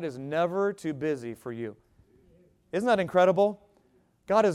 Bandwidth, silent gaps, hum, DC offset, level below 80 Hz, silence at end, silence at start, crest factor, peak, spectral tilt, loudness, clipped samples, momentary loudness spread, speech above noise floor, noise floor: 13.5 kHz; none; none; under 0.1%; -68 dBFS; 0 s; 0 s; 18 dB; -10 dBFS; -6.5 dB/octave; -27 LUFS; under 0.1%; 15 LU; 39 dB; -65 dBFS